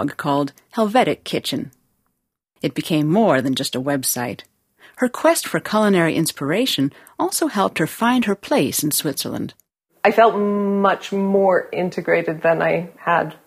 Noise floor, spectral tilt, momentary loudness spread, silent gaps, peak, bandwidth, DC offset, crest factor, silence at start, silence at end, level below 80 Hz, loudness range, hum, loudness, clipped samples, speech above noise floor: -73 dBFS; -4.5 dB/octave; 9 LU; none; 0 dBFS; 15.5 kHz; under 0.1%; 18 dB; 0 s; 0.1 s; -62 dBFS; 3 LU; none; -19 LUFS; under 0.1%; 54 dB